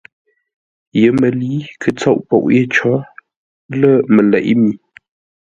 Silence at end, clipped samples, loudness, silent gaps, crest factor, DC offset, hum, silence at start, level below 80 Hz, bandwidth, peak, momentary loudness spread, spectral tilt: 0.65 s; under 0.1%; -14 LUFS; 3.36-3.69 s; 14 dB; under 0.1%; none; 0.95 s; -54 dBFS; 7.8 kHz; 0 dBFS; 10 LU; -7.5 dB/octave